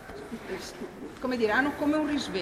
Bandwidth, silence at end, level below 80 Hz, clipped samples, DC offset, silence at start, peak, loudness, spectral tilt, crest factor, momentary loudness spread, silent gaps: 15 kHz; 0 s; -56 dBFS; under 0.1%; under 0.1%; 0 s; -12 dBFS; -29 LUFS; -4.5 dB/octave; 18 dB; 15 LU; none